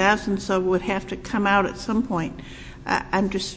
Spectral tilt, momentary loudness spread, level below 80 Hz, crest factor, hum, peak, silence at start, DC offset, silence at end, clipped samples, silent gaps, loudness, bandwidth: -5 dB/octave; 12 LU; -44 dBFS; 20 dB; none; -4 dBFS; 0 s; under 0.1%; 0 s; under 0.1%; none; -23 LUFS; 8 kHz